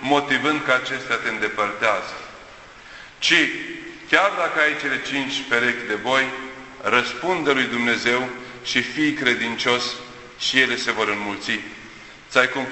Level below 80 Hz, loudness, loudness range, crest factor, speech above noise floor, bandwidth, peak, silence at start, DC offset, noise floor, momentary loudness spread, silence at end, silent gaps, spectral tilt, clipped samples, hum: -58 dBFS; -21 LUFS; 2 LU; 22 dB; 21 dB; 8.4 kHz; 0 dBFS; 0 s; under 0.1%; -43 dBFS; 17 LU; 0 s; none; -3 dB/octave; under 0.1%; none